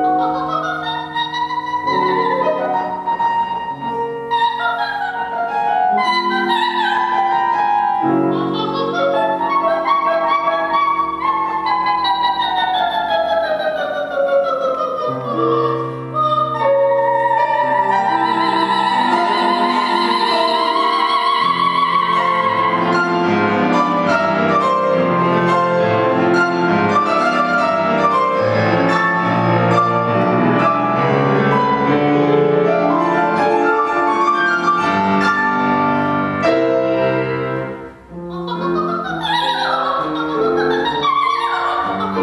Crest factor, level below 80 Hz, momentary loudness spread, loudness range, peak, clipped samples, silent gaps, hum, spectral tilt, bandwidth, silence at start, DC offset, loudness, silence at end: 14 dB; -54 dBFS; 5 LU; 4 LU; -2 dBFS; under 0.1%; none; none; -6 dB/octave; 12 kHz; 0 s; under 0.1%; -16 LUFS; 0 s